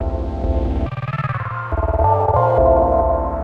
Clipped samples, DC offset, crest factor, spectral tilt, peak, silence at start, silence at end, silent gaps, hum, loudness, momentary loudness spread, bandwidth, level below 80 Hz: under 0.1%; under 0.1%; 14 dB; -10 dB/octave; -2 dBFS; 0 s; 0 s; none; none; -18 LUFS; 10 LU; 5.2 kHz; -24 dBFS